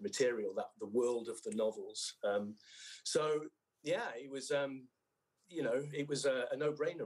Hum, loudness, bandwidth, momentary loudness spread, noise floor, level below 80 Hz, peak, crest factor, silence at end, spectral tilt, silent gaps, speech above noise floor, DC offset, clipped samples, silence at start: none; -38 LUFS; 12.5 kHz; 12 LU; -83 dBFS; -90 dBFS; -22 dBFS; 18 dB; 0 s; -3.5 dB/octave; none; 45 dB; under 0.1%; under 0.1%; 0 s